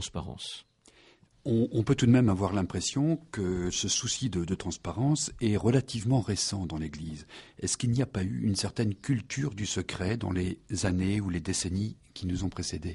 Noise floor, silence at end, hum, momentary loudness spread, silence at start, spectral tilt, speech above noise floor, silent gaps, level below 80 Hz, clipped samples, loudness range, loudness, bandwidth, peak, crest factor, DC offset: -60 dBFS; 0 s; none; 11 LU; 0 s; -5 dB/octave; 31 dB; none; -50 dBFS; under 0.1%; 4 LU; -30 LUFS; 11.5 kHz; -12 dBFS; 18 dB; under 0.1%